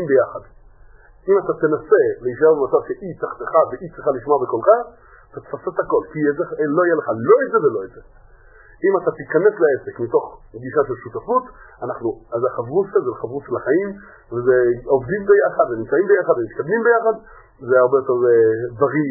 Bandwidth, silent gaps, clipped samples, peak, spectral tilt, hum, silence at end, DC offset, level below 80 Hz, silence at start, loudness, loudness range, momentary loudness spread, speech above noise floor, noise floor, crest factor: 2.2 kHz; none; under 0.1%; 0 dBFS; -15 dB/octave; none; 0 s; under 0.1%; -52 dBFS; 0 s; -18 LUFS; 5 LU; 14 LU; 28 dB; -46 dBFS; 18 dB